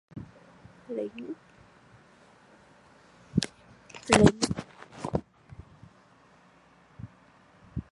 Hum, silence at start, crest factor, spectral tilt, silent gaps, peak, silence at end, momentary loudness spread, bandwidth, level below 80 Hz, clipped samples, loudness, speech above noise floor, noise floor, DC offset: none; 0.15 s; 30 dB; -5 dB/octave; none; -2 dBFS; 0.1 s; 29 LU; 11.5 kHz; -50 dBFS; under 0.1%; -28 LUFS; 34 dB; -59 dBFS; under 0.1%